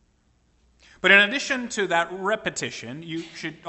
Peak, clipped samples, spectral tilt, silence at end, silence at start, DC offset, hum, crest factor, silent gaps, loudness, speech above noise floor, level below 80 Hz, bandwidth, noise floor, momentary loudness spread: -2 dBFS; under 0.1%; -2.5 dB/octave; 0 s; 1.05 s; under 0.1%; none; 22 dB; none; -21 LUFS; 40 dB; -64 dBFS; 8.6 kHz; -64 dBFS; 18 LU